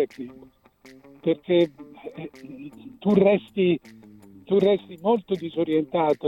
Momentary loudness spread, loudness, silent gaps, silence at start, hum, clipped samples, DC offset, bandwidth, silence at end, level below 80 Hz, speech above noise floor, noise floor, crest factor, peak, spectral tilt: 20 LU; -23 LUFS; none; 0 s; none; under 0.1%; under 0.1%; 7.6 kHz; 0 s; -64 dBFS; 28 dB; -51 dBFS; 20 dB; -6 dBFS; -8.5 dB/octave